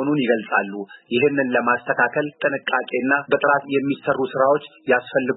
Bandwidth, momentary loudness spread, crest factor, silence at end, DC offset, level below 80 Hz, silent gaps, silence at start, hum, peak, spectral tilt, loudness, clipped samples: 4.1 kHz; 5 LU; 16 dB; 0 s; under 0.1%; -70 dBFS; none; 0 s; none; -4 dBFS; -10.5 dB/octave; -20 LUFS; under 0.1%